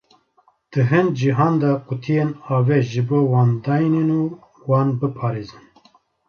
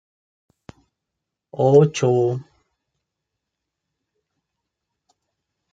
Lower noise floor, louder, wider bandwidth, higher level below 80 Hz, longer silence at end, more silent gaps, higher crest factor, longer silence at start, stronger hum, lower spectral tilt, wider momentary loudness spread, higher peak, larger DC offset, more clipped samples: second, -60 dBFS vs -82 dBFS; about the same, -19 LUFS vs -18 LUFS; second, 6.8 kHz vs 9.2 kHz; first, -58 dBFS vs -66 dBFS; second, 0.8 s vs 3.3 s; neither; second, 16 dB vs 22 dB; second, 0.7 s vs 1.6 s; neither; first, -9 dB/octave vs -7 dB/octave; second, 9 LU vs 16 LU; about the same, -4 dBFS vs -2 dBFS; neither; neither